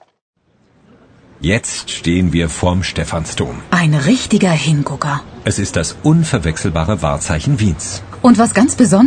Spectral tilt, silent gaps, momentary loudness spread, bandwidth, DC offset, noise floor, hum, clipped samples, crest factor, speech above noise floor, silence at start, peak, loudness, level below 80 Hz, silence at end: -5.5 dB/octave; none; 9 LU; 9.6 kHz; under 0.1%; -54 dBFS; none; under 0.1%; 14 dB; 40 dB; 1.4 s; 0 dBFS; -15 LUFS; -32 dBFS; 0 s